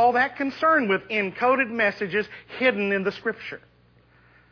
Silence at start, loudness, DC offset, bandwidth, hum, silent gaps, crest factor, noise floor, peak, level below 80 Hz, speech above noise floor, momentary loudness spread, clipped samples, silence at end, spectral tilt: 0 s; -23 LUFS; under 0.1%; 5.4 kHz; 60 Hz at -55 dBFS; none; 16 dB; -58 dBFS; -8 dBFS; -64 dBFS; 34 dB; 12 LU; under 0.1%; 0.95 s; -6.5 dB/octave